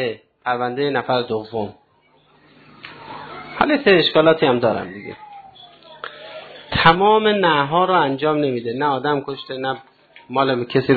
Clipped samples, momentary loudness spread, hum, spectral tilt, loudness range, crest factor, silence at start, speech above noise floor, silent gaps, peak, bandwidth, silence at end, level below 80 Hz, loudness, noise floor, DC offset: under 0.1%; 21 LU; none; -8 dB/octave; 7 LU; 18 dB; 0 s; 39 dB; none; 0 dBFS; 4.8 kHz; 0 s; -52 dBFS; -18 LUFS; -57 dBFS; under 0.1%